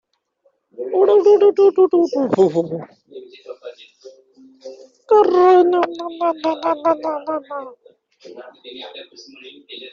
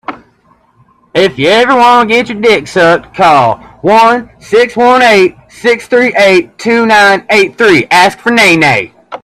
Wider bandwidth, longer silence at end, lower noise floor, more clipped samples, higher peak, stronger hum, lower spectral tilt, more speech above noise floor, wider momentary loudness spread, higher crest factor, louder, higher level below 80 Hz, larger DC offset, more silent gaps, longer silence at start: second, 7.4 kHz vs 14.5 kHz; about the same, 0.05 s vs 0.05 s; first, -63 dBFS vs -49 dBFS; second, under 0.1% vs 0.4%; about the same, -2 dBFS vs 0 dBFS; neither; about the same, -5 dB/octave vs -4 dB/octave; first, 46 dB vs 42 dB; first, 26 LU vs 7 LU; first, 16 dB vs 8 dB; second, -16 LUFS vs -7 LUFS; second, -68 dBFS vs -46 dBFS; neither; neither; first, 0.8 s vs 0.1 s